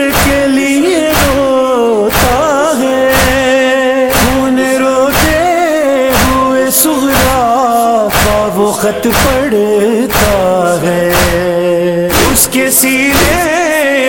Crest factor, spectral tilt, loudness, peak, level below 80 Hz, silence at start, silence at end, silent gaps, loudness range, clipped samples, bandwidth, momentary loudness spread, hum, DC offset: 10 dB; -3.5 dB/octave; -9 LUFS; 0 dBFS; -24 dBFS; 0 s; 0 s; none; 1 LU; under 0.1%; 17.5 kHz; 3 LU; none; under 0.1%